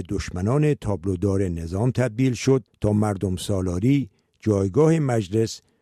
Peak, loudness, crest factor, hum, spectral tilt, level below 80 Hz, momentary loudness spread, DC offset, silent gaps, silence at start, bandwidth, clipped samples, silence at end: -8 dBFS; -23 LUFS; 14 dB; none; -7 dB/octave; -44 dBFS; 7 LU; under 0.1%; none; 0 s; 13.5 kHz; under 0.1%; 0.25 s